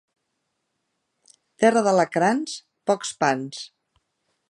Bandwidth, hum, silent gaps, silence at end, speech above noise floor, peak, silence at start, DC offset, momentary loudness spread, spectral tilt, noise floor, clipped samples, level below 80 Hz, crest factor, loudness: 11.5 kHz; none; none; 0.85 s; 55 dB; -4 dBFS; 1.6 s; under 0.1%; 15 LU; -4.5 dB/octave; -77 dBFS; under 0.1%; -74 dBFS; 20 dB; -22 LUFS